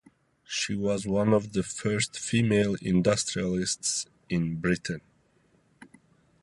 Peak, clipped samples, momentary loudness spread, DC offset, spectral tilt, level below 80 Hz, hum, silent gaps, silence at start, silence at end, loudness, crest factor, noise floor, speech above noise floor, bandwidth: -10 dBFS; under 0.1%; 7 LU; under 0.1%; -4.5 dB/octave; -54 dBFS; none; none; 0.5 s; 0.55 s; -27 LUFS; 18 dB; -66 dBFS; 39 dB; 11.5 kHz